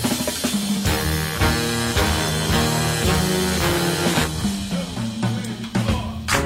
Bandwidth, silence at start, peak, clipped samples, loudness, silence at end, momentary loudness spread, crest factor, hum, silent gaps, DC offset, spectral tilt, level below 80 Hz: 16.5 kHz; 0 s; -6 dBFS; under 0.1%; -21 LUFS; 0 s; 6 LU; 14 dB; none; none; under 0.1%; -4 dB/octave; -32 dBFS